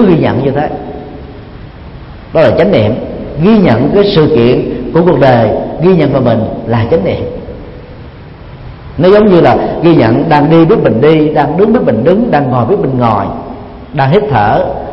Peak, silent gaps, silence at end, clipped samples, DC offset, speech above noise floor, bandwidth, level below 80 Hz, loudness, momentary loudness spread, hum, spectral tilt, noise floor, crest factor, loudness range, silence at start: 0 dBFS; none; 0 s; 0.3%; under 0.1%; 21 dB; 5.8 kHz; -32 dBFS; -9 LUFS; 21 LU; none; -10 dB/octave; -29 dBFS; 8 dB; 5 LU; 0 s